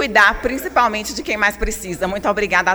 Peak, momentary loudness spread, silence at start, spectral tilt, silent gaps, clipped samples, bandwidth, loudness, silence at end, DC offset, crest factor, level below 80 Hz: 0 dBFS; 10 LU; 0 s; -3 dB/octave; none; under 0.1%; over 20 kHz; -18 LUFS; 0 s; under 0.1%; 16 dB; -34 dBFS